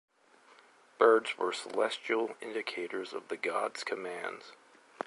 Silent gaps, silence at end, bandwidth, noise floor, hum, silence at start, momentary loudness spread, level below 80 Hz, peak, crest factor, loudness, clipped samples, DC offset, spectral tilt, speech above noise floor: none; 0.05 s; 11.5 kHz; -62 dBFS; none; 1 s; 14 LU; -88 dBFS; -10 dBFS; 24 dB; -32 LUFS; under 0.1%; under 0.1%; -2.5 dB/octave; 29 dB